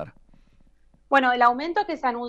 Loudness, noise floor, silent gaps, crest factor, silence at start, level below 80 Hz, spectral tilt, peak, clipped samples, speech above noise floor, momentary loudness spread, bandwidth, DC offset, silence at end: -22 LUFS; -57 dBFS; none; 18 dB; 0 s; -56 dBFS; -4.5 dB/octave; -6 dBFS; under 0.1%; 35 dB; 8 LU; 8.6 kHz; under 0.1%; 0 s